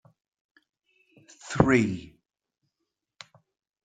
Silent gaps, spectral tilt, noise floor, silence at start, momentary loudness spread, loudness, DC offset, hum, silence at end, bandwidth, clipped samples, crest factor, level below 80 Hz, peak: none; -6.5 dB/octave; -84 dBFS; 1.45 s; 28 LU; -25 LUFS; under 0.1%; none; 1.8 s; 9.4 kHz; under 0.1%; 30 dB; -52 dBFS; -2 dBFS